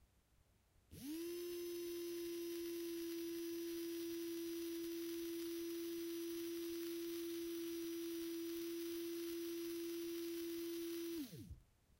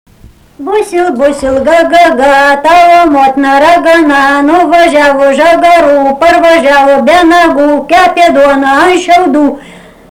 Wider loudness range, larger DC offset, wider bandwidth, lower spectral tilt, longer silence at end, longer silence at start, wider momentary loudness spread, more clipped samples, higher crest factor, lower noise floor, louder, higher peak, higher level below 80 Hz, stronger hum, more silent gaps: about the same, 1 LU vs 1 LU; neither; second, 16 kHz vs 19 kHz; about the same, -3.5 dB/octave vs -3.5 dB/octave; about the same, 0.35 s vs 0.4 s; second, 0 s vs 0.6 s; second, 1 LU vs 6 LU; second, under 0.1% vs 2%; first, 12 dB vs 6 dB; first, -75 dBFS vs -37 dBFS; second, -46 LUFS vs -5 LUFS; second, -34 dBFS vs 0 dBFS; second, -74 dBFS vs -36 dBFS; neither; neither